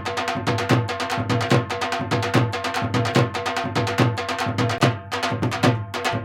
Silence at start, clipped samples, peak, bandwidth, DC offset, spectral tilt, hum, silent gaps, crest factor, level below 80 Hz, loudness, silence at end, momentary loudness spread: 0 s; under 0.1%; -2 dBFS; 16 kHz; under 0.1%; -5.5 dB/octave; none; none; 20 dB; -54 dBFS; -22 LUFS; 0 s; 5 LU